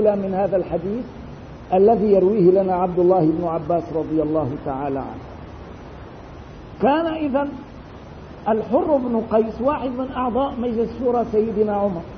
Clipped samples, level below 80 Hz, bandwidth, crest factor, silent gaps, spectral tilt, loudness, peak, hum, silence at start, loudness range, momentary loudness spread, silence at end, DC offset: under 0.1%; -44 dBFS; 6.4 kHz; 16 dB; none; -9.5 dB/octave; -20 LUFS; -4 dBFS; none; 0 s; 7 LU; 22 LU; 0 s; under 0.1%